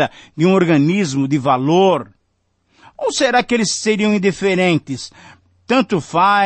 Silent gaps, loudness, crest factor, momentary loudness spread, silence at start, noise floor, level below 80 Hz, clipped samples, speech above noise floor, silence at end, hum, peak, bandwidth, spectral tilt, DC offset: none; -16 LUFS; 14 dB; 8 LU; 0 s; -65 dBFS; -56 dBFS; under 0.1%; 50 dB; 0 s; none; -2 dBFS; 8.8 kHz; -5 dB/octave; under 0.1%